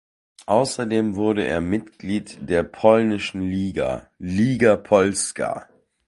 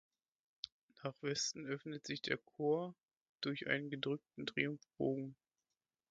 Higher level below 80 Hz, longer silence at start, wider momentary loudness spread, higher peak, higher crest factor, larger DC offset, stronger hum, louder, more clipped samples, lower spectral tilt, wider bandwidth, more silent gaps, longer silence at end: first, -46 dBFS vs -80 dBFS; second, 0.4 s vs 0.65 s; about the same, 10 LU vs 12 LU; first, -2 dBFS vs -20 dBFS; about the same, 20 dB vs 24 dB; neither; neither; first, -21 LUFS vs -42 LUFS; neither; first, -5.5 dB/octave vs -3.5 dB/octave; first, 11.5 kHz vs 7.6 kHz; second, none vs 0.72-0.88 s, 3.03-3.09 s, 3.17-3.36 s; second, 0.45 s vs 0.75 s